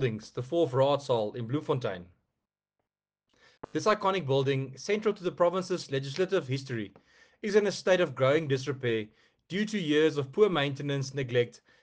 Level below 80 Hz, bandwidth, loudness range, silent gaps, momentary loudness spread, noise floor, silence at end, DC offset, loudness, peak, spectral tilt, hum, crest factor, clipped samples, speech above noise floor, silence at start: -70 dBFS; 9.4 kHz; 4 LU; none; 10 LU; -87 dBFS; 0.3 s; under 0.1%; -29 LUFS; -12 dBFS; -6 dB/octave; none; 18 dB; under 0.1%; 59 dB; 0 s